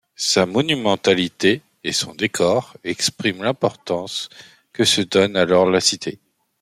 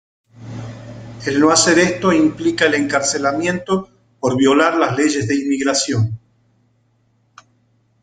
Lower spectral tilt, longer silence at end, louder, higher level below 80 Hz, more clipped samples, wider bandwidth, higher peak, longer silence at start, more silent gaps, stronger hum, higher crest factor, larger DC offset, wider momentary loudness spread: about the same, -3.5 dB/octave vs -4 dB/octave; second, 0.45 s vs 1.85 s; second, -19 LUFS vs -16 LUFS; second, -60 dBFS vs -54 dBFS; neither; first, 15.5 kHz vs 9.6 kHz; about the same, -2 dBFS vs 0 dBFS; second, 0.2 s vs 0.4 s; neither; neither; about the same, 18 dB vs 18 dB; neither; second, 11 LU vs 19 LU